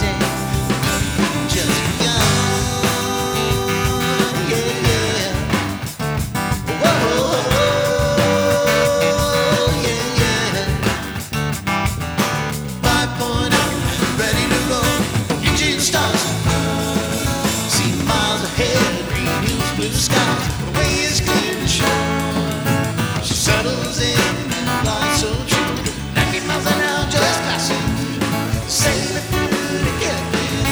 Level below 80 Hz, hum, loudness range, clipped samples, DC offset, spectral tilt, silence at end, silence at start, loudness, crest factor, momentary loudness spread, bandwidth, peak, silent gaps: -32 dBFS; none; 2 LU; under 0.1%; under 0.1%; -4 dB/octave; 0 s; 0 s; -18 LUFS; 18 dB; 5 LU; over 20 kHz; 0 dBFS; none